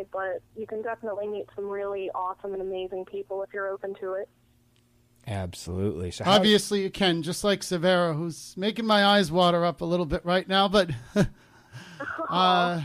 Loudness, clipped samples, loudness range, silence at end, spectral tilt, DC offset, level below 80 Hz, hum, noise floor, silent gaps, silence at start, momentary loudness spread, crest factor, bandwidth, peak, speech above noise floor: -26 LUFS; under 0.1%; 11 LU; 0 s; -5 dB/octave; under 0.1%; -52 dBFS; none; -63 dBFS; none; 0 s; 14 LU; 16 dB; 15.5 kHz; -10 dBFS; 37 dB